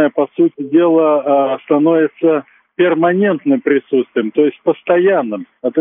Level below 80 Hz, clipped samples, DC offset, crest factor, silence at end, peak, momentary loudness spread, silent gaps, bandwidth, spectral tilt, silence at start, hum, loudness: -70 dBFS; under 0.1%; under 0.1%; 12 dB; 0 s; 0 dBFS; 6 LU; none; 3.7 kHz; -5.5 dB/octave; 0 s; none; -14 LUFS